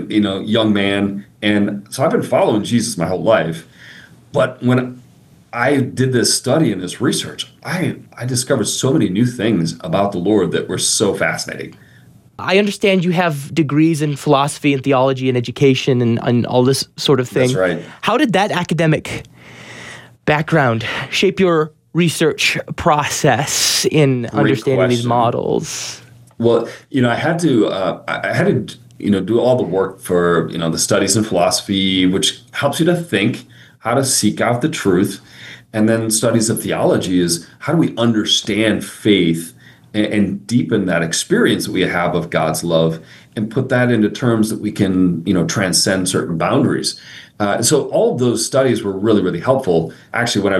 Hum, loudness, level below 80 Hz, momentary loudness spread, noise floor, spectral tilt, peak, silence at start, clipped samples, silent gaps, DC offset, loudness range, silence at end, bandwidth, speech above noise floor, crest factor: none; -16 LUFS; -54 dBFS; 7 LU; -47 dBFS; -4.5 dB/octave; 0 dBFS; 0 s; under 0.1%; none; under 0.1%; 3 LU; 0 s; 16 kHz; 31 dB; 16 dB